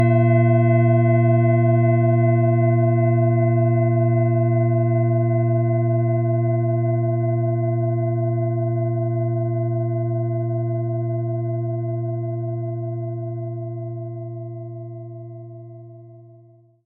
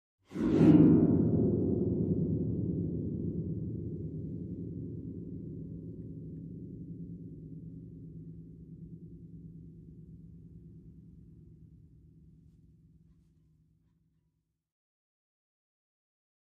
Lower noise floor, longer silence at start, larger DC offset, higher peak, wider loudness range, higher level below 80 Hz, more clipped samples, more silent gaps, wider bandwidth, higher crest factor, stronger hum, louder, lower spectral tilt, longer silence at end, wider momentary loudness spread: second, -51 dBFS vs -80 dBFS; second, 0 s vs 0.3 s; neither; first, -6 dBFS vs -10 dBFS; second, 13 LU vs 26 LU; second, -68 dBFS vs -54 dBFS; neither; neither; second, 2.8 kHz vs 4.7 kHz; second, 14 dB vs 24 dB; neither; first, -20 LUFS vs -30 LUFS; second, -8 dB/octave vs -11 dB/octave; second, 0.65 s vs 4.85 s; second, 15 LU vs 26 LU